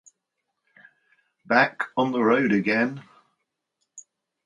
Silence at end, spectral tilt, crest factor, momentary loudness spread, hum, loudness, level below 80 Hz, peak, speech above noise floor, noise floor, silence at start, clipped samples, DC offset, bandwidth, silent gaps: 0.45 s; -6 dB/octave; 24 dB; 6 LU; none; -22 LUFS; -74 dBFS; -4 dBFS; 58 dB; -80 dBFS; 1.5 s; under 0.1%; under 0.1%; 10.5 kHz; none